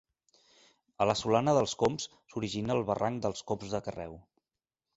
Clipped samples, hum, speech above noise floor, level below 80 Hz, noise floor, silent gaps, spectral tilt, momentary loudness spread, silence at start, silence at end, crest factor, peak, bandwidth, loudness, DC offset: under 0.1%; none; over 59 dB; -60 dBFS; under -90 dBFS; none; -5 dB/octave; 13 LU; 1 s; 0.75 s; 22 dB; -10 dBFS; 8.2 kHz; -31 LUFS; under 0.1%